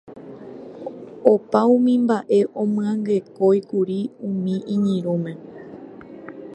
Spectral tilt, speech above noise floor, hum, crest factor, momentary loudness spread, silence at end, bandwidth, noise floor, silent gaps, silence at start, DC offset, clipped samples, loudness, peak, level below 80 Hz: -8.5 dB/octave; 20 dB; none; 20 dB; 22 LU; 0 s; 9 kHz; -39 dBFS; none; 0.1 s; under 0.1%; under 0.1%; -20 LUFS; 0 dBFS; -68 dBFS